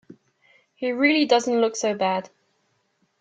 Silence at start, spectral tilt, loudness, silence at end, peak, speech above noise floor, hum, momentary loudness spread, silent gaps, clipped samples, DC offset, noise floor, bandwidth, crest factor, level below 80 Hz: 0.1 s; -3.5 dB/octave; -22 LUFS; 0.95 s; -6 dBFS; 48 dB; none; 10 LU; none; under 0.1%; under 0.1%; -70 dBFS; 9.2 kHz; 18 dB; -74 dBFS